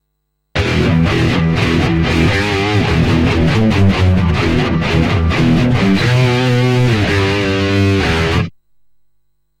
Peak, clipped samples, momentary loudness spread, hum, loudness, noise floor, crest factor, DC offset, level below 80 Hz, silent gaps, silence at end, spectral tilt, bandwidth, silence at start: 0 dBFS; under 0.1%; 2 LU; none; -13 LUFS; -69 dBFS; 12 dB; under 0.1%; -26 dBFS; none; 1.1 s; -6.5 dB/octave; 13 kHz; 0.55 s